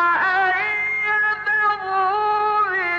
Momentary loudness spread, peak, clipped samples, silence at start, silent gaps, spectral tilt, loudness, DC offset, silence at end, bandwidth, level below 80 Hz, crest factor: 2 LU; -10 dBFS; under 0.1%; 0 s; none; -4 dB/octave; -19 LUFS; under 0.1%; 0 s; 8 kHz; -62 dBFS; 10 dB